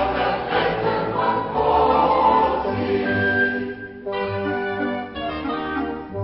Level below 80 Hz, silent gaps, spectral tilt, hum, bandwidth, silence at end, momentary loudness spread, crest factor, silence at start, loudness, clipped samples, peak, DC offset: -44 dBFS; none; -10.5 dB/octave; none; 5.8 kHz; 0 s; 11 LU; 16 dB; 0 s; -21 LUFS; under 0.1%; -4 dBFS; under 0.1%